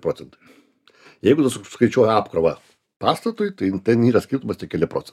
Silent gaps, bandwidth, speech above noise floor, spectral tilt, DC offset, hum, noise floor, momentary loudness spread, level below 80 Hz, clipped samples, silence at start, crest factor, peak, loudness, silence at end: none; 14 kHz; 32 dB; -6.5 dB/octave; under 0.1%; none; -52 dBFS; 9 LU; -56 dBFS; under 0.1%; 0.05 s; 20 dB; -2 dBFS; -20 LUFS; 0.1 s